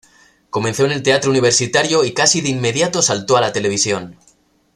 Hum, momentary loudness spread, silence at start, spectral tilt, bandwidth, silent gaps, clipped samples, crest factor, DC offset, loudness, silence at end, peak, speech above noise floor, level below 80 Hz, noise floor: none; 6 LU; 0.55 s; -3 dB/octave; 13.5 kHz; none; under 0.1%; 18 dB; under 0.1%; -15 LUFS; 0.65 s; 0 dBFS; 40 dB; -54 dBFS; -56 dBFS